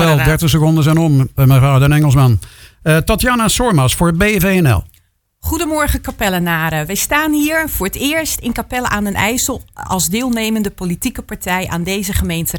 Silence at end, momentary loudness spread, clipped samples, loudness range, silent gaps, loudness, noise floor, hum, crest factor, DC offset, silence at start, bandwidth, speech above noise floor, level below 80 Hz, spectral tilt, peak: 0 s; 9 LU; under 0.1%; 5 LU; none; -14 LUFS; -55 dBFS; none; 14 dB; under 0.1%; 0 s; 19.5 kHz; 41 dB; -28 dBFS; -5 dB/octave; 0 dBFS